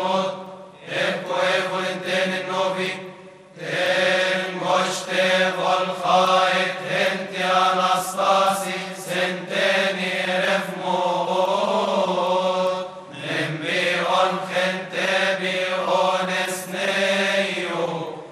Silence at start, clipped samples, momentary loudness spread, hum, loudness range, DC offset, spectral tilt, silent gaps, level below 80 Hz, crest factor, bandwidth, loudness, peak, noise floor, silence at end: 0 s; under 0.1%; 8 LU; none; 3 LU; under 0.1%; -3.5 dB/octave; none; -74 dBFS; 18 dB; 14.5 kHz; -21 LUFS; -4 dBFS; -43 dBFS; 0 s